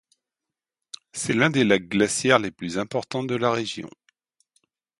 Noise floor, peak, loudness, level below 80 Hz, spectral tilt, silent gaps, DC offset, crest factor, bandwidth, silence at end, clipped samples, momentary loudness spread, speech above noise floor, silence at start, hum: -88 dBFS; -2 dBFS; -23 LUFS; -62 dBFS; -4 dB/octave; none; under 0.1%; 24 dB; 11.5 kHz; 1.15 s; under 0.1%; 17 LU; 65 dB; 1.15 s; none